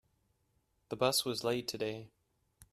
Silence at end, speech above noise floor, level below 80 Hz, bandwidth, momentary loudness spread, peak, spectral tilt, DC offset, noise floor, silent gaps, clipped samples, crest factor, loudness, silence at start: 0.1 s; 42 dB; -72 dBFS; 15 kHz; 14 LU; -14 dBFS; -3.5 dB/octave; under 0.1%; -77 dBFS; none; under 0.1%; 24 dB; -34 LUFS; 0.9 s